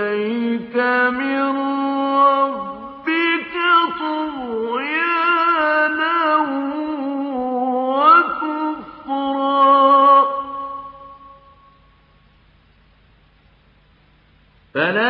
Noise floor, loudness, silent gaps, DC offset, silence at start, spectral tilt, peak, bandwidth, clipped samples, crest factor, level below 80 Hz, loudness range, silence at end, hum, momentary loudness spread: -54 dBFS; -17 LUFS; none; under 0.1%; 0 s; -8 dB/octave; -2 dBFS; 5.6 kHz; under 0.1%; 18 dB; -60 dBFS; 4 LU; 0 s; none; 14 LU